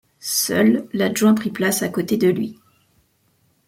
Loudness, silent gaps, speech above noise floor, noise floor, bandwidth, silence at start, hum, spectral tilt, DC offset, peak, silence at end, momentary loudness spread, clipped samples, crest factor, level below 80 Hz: -19 LUFS; none; 44 dB; -63 dBFS; 16.5 kHz; 0.25 s; none; -4.5 dB/octave; under 0.1%; -4 dBFS; 1.15 s; 6 LU; under 0.1%; 16 dB; -62 dBFS